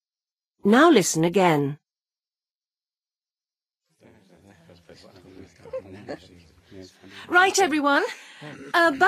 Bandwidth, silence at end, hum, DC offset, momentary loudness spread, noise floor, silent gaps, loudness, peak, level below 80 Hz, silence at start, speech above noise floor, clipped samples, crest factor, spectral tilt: 15.5 kHz; 0 s; none; under 0.1%; 24 LU; under -90 dBFS; none; -20 LUFS; -6 dBFS; -68 dBFS; 0.65 s; over 69 dB; under 0.1%; 20 dB; -4 dB/octave